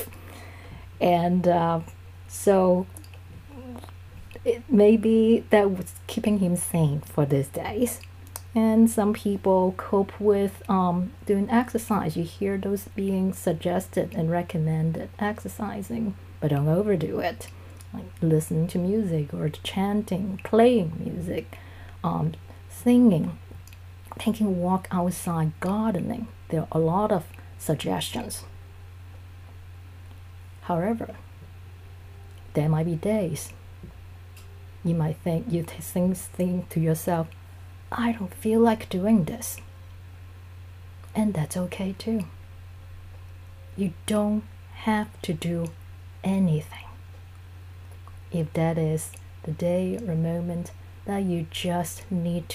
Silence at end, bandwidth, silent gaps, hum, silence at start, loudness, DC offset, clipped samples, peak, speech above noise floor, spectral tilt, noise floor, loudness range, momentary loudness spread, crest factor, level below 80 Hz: 0 s; 15.5 kHz; none; none; 0 s; -25 LUFS; under 0.1%; under 0.1%; -4 dBFS; 19 dB; -6.5 dB/octave; -44 dBFS; 8 LU; 24 LU; 22 dB; -52 dBFS